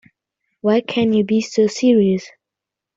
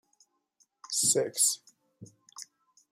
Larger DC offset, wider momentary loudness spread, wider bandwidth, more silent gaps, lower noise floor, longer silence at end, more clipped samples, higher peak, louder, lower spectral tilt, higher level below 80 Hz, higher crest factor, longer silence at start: neither; second, 6 LU vs 23 LU; second, 7.8 kHz vs 16 kHz; neither; first, -85 dBFS vs -72 dBFS; first, 0.7 s vs 0.5 s; neither; first, -4 dBFS vs -12 dBFS; first, -17 LUFS vs -26 LUFS; first, -6 dB/octave vs -1 dB/octave; first, -60 dBFS vs -84 dBFS; second, 14 dB vs 22 dB; second, 0.65 s vs 0.9 s